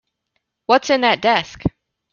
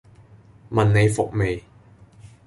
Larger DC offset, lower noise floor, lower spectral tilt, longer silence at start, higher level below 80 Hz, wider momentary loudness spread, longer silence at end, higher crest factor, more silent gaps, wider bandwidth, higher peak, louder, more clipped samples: neither; first, -73 dBFS vs -50 dBFS; second, -4.5 dB/octave vs -6.5 dB/octave; about the same, 0.7 s vs 0.7 s; about the same, -44 dBFS vs -44 dBFS; first, 11 LU vs 8 LU; second, 0.45 s vs 0.85 s; about the same, 18 dB vs 18 dB; neither; second, 7.2 kHz vs 11.5 kHz; first, -2 dBFS vs -6 dBFS; first, -17 LUFS vs -21 LUFS; neither